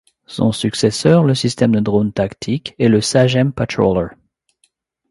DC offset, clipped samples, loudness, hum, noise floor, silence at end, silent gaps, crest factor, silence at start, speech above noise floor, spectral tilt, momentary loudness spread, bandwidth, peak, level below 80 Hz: under 0.1%; under 0.1%; -16 LUFS; none; -63 dBFS; 1 s; none; 16 dB; 0.3 s; 48 dB; -6 dB/octave; 8 LU; 11.5 kHz; 0 dBFS; -44 dBFS